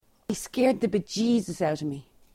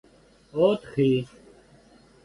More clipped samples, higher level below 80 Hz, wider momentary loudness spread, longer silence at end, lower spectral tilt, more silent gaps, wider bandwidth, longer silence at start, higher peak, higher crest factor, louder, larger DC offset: neither; about the same, -58 dBFS vs -60 dBFS; about the same, 11 LU vs 12 LU; second, 0.35 s vs 1 s; second, -5.5 dB/octave vs -8 dB/octave; neither; first, 15.5 kHz vs 11 kHz; second, 0.3 s vs 0.55 s; about the same, -10 dBFS vs -8 dBFS; about the same, 16 dB vs 18 dB; second, -27 LUFS vs -24 LUFS; neither